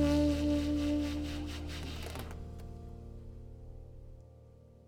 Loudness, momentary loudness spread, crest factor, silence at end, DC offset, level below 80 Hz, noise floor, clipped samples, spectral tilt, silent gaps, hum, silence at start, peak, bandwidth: -35 LUFS; 22 LU; 18 dB; 0.15 s; under 0.1%; -44 dBFS; -57 dBFS; under 0.1%; -6.5 dB/octave; none; none; 0 s; -18 dBFS; 16 kHz